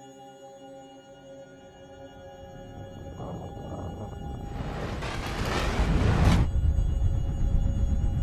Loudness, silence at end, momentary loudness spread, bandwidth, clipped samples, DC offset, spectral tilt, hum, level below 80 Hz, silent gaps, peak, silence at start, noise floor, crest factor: -29 LUFS; 0 s; 22 LU; 13.5 kHz; under 0.1%; under 0.1%; -6.5 dB/octave; none; -30 dBFS; none; -10 dBFS; 0 s; -48 dBFS; 18 dB